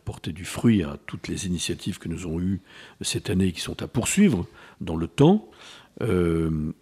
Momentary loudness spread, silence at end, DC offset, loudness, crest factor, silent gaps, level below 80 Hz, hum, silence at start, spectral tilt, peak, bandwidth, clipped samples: 14 LU; 0.1 s; under 0.1%; -25 LUFS; 20 dB; none; -48 dBFS; none; 0.05 s; -5.5 dB/octave; -4 dBFS; 15 kHz; under 0.1%